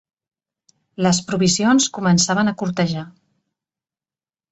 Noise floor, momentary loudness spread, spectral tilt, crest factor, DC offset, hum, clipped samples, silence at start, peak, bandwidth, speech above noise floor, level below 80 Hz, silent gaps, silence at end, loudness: under -90 dBFS; 7 LU; -4 dB/octave; 18 dB; under 0.1%; none; under 0.1%; 1 s; -2 dBFS; 8.2 kHz; over 72 dB; -56 dBFS; none; 1.4 s; -18 LUFS